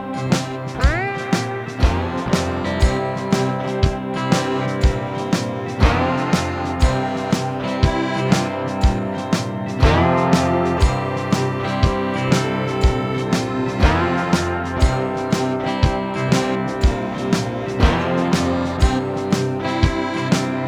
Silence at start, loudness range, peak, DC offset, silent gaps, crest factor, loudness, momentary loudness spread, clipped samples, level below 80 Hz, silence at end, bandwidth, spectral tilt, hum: 0 s; 2 LU; 0 dBFS; under 0.1%; none; 18 dB; -20 LUFS; 5 LU; under 0.1%; -26 dBFS; 0 s; 14 kHz; -6 dB/octave; none